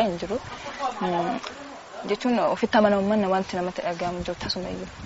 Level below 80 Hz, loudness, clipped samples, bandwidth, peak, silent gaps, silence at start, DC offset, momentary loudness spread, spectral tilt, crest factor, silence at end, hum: -52 dBFS; -26 LUFS; under 0.1%; 8 kHz; -6 dBFS; none; 0 s; under 0.1%; 14 LU; -4 dB/octave; 20 dB; 0 s; none